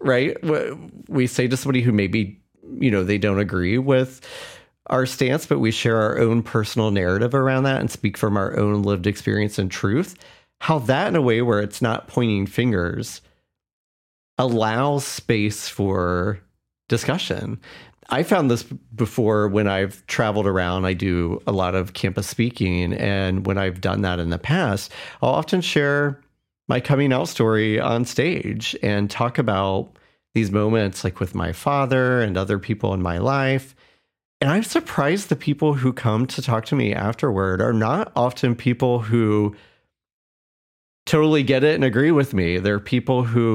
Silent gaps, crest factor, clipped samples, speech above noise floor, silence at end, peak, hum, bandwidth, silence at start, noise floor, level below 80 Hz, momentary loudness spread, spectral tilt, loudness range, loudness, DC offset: 13.73-14.37 s, 34.25-34.40 s, 40.13-41.06 s; 16 dB; under 0.1%; over 70 dB; 0 s; -4 dBFS; none; 16.5 kHz; 0 s; under -90 dBFS; -54 dBFS; 7 LU; -6 dB/octave; 3 LU; -21 LUFS; under 0.1%